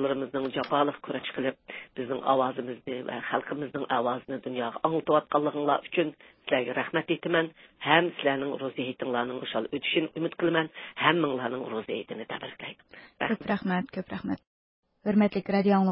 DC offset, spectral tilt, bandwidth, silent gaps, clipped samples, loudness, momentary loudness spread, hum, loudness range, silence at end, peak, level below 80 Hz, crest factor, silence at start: under 0.1%; -10 dB/octave; 5.8 kHz; 14.47-14.83 s; under 0.1%; -29 LUFS; 11 LU; none; 3 LU; 0 s; -6 dBFS; -68 dBFS; 24 dB; 0 s